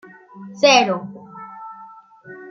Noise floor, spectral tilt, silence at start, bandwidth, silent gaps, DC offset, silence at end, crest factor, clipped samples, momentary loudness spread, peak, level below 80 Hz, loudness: -43 dBFS; -3 dB/octave; 0.35 s; 7.4 kHz; none; under 0.1%; 0.05 s; 20 dB; under 0.1%; 26 LU; -2 dBFS; -72 dBFS; -16 LUFS